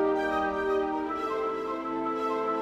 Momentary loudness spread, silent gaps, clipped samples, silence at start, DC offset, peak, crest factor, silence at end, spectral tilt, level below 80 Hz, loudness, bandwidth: 4 LU; none; under 0.1%; 0 s; under 0.1%; -18 dBFS; 12 dB; 0 s; -5.5 dB/octave; -56 dBFS; -29 LUFS; 9.2 kHz